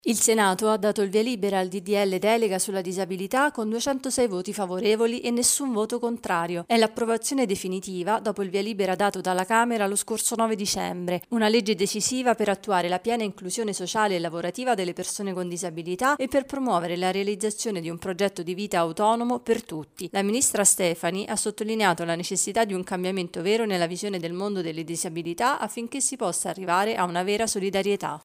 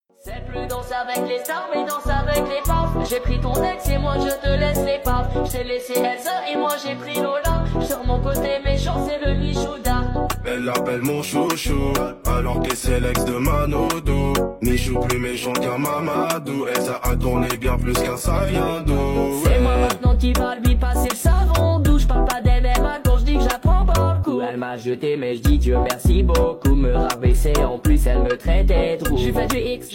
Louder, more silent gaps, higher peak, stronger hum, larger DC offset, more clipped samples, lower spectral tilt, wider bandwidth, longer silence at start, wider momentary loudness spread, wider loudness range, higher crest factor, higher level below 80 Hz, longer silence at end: second, -25 LUFS vs -21 LUFS; neither; about the same, -6 dBFS vs -4 dBFS; neither; neither; neither; second, -3.5 dB/octave vs -5.5 dB/octave; about the same, 16 kHz vs 17 kHz; second, 0.05 s vs 0.25 s; first, 8 LU vs 5 LU; about the same, 3 LU vs 4 LU; first, 20 dB vs 14 dB; second, -64 dBFS vs -22 dBFS; about the same, 0.05 s vs 0 s